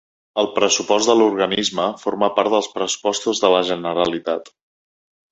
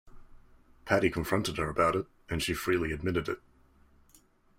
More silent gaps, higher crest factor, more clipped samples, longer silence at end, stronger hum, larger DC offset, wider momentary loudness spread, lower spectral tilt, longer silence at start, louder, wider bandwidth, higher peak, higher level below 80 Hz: neither; about the same, 20 dB vs 22 dB; neither; second, 0.85 s vs 1.2 s; neither; neither; second, 7 LU vs 10 LU; second, -2.5 dB/octave vs -5 dB/octave; first, 0.35 s vs 0.05 s; first, -19 LUFS vs -31 LUFS; second, 8.2 kHz vs 16 kHz; first, 0 dBFS vs -10 dBFS; second, -60 dBFS vs -52 dBFS